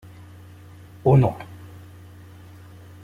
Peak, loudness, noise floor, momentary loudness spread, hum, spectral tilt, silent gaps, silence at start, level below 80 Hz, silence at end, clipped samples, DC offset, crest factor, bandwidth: -4 dBFS; -20 LUFS; -44 dBFS; 27 LU; none; -10 dB/octave; none; 1.05 s; -50 dBFS; 1.5 s; under 0.1%; under 0.1%; 20 dB; 4.8 kHz